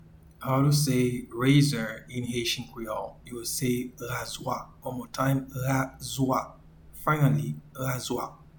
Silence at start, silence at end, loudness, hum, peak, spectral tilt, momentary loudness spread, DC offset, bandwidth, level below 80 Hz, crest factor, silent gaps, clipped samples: 0 s; 0.25 s; -28 LUFS; none; -10 dBFS; -5.5 dB/octave; 13 LU; under 0.1%; 19 kHz; -54 dBFS; 18 dB; none; under 0.1%